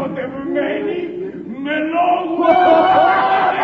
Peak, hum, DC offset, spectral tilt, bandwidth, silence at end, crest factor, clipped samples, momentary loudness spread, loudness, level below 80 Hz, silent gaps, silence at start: -2 dBFS; none; under 0.1%; -7 dB/octave; 5.8 kHz; 0 s; 14 dB; under 0.1%; 14 LU; -15 LUFS; -54 dBFS; none; 0 s